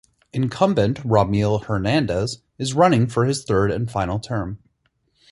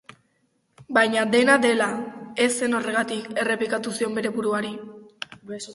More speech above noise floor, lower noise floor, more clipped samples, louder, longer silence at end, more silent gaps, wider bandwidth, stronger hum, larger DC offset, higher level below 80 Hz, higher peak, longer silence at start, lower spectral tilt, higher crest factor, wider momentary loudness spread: about the same, 48 dB vs 46 dB; about the same, -68 dBFS vs -69 dBFS; neither; about the same, -21 LUFS vs -23 LUFS; first, 0.75 s vs 0 s; neither; about the same, 11.5 kHz vs 11.5 kHz; neither; neither; first, -44 dBFS vs -68 dBFS; about the same, -2 dBFS vs -2 dBFS; second, 0.35 s vs 0.8 s; first, -6.5 dB/octave vs -3.5 dB/octave; about the same, 18 dB vs 22 dB; second, 11 LU vs 19 LU